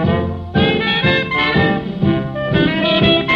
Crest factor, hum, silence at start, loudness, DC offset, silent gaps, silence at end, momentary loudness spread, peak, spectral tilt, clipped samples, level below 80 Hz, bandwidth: 14 dB; none; 0 s; -15 LUFS; under 0.1%; none; 0 s; 5 LU; -2 dBFS; -7.5 dB/octave; under 0.1%; -36 dBFS; 6.8 kHz